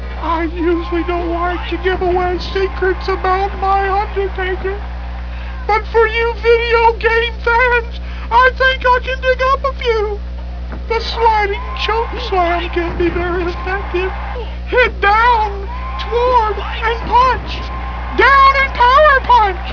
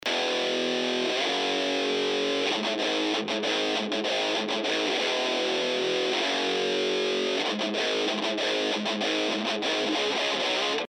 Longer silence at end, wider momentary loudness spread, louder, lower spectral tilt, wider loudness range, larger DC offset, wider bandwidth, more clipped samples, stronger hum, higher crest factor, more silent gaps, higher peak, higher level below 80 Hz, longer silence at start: about the same, 0 s vs 0 s; first, 14 LU vs 2 LU; first, -14 LUFS vs -26 LUFS; first, -6.5 dB/octave vs -2.5 dB/octave; first, 5 LU vs 0 LU; first, 0.4% vs under 0.1%; second, 5.4 kHz vs 15.5 kHz; neither; first, 60 Hz at -25 dBFS vs none; about the same, 14 dB vs 14 dB; neither; first, 0 dBFS vs -12 dBFS; first, -24 dBFS vs -88 dBFS; about the same, 0 s vs 0.05 s